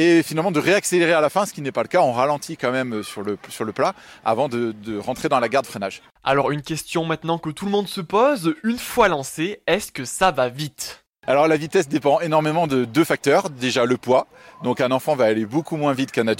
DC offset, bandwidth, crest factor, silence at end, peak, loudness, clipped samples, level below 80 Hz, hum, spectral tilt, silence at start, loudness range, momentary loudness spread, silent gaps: under 0.1%; 16.5 kHz; 18 dB; 0 s; -4 dBFS; -21 LUFS; under 0.1%; -56 dBFS; none; -5 dB/octave; 0 s; 4 LU; 10 LU; 11.09-11.13 s